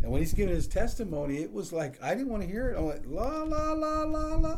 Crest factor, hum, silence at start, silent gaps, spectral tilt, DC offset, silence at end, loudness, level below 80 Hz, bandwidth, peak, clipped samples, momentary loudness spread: 16 dB; none; 0 s; none; -6.5 dB/octave; under 0.1%; 0 s; -32 LUFS; -34 dBFS; 15 kHz; -12 dBFS; under 0.1%; 5 LU